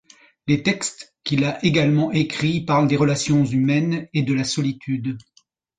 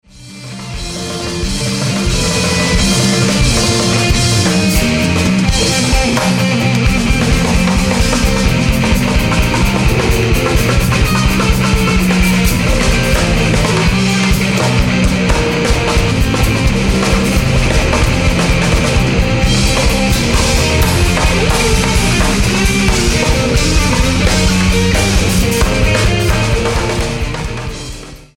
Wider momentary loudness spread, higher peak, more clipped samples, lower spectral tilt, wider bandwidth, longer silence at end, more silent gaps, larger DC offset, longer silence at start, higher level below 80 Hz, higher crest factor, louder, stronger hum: first, 8 LU vs 4 LU; second, -4 dBFS vs 0 dBFS; neither; about the same, -5.5 dB/octave vs -4.5 dB/octave; second, 9.4 kHz vs 17 kHz; first, 0.6 s vs 0.1 s; neither; neither; first, 0.45 s vs 0.15 s; second, -54 dBFS vs -18 dBFS; first, 18 dB vs 12 dB; second, -21 LUFS vs -12 LUFS; neither